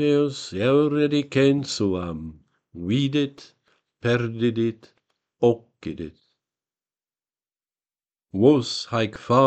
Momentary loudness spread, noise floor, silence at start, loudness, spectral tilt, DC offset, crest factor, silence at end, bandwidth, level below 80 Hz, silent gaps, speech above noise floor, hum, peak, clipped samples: 14 LU; under -90 dBFS; 0 s; -23 LUFS; -6.5 dB/octave; under 0.1%; 20 dB; 0 s; 9 kHz; -56 dBFS; none; over 68 dB; none; -4 dBFS; under 0.1%